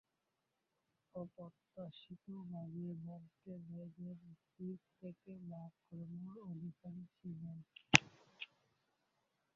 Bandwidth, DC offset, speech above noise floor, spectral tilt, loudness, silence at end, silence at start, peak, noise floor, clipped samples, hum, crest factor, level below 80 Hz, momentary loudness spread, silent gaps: 7 kHz; under 0.1%; 43 dB; -2.5 dB/octave; -42 LUFS; 1.1 s; 1.15 s; -4 dBFS; -87 dBFS; under 0.1%; none; 44 dB; -76 dBFS; 13 LU; none